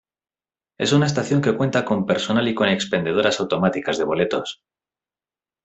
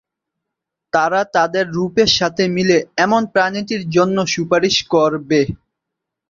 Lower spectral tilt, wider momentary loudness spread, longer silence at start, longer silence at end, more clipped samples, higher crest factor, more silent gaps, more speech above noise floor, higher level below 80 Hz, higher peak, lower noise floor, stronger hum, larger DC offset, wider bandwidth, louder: about the same, -5.5 dB/octave vs -4.5 dB/octave; about the same, 4 LU vs 5 LU; second, 0.8 s vs 0.95 s; first, 1.1 s vs 0.75 s; neither; about the same, 18 dB vs 16 dB; neither; first, over 70 dB vs 65 dB; second, -58 dBFS vs -50 dBFS; about the same, -4 dBFS vs -2 dBFS; first, under -90 dBFS vs -81 dBFS; neither; neither; first, 8.4 kHz vs 7.6 kHz; second, -20 LUFS vs -16 LUFS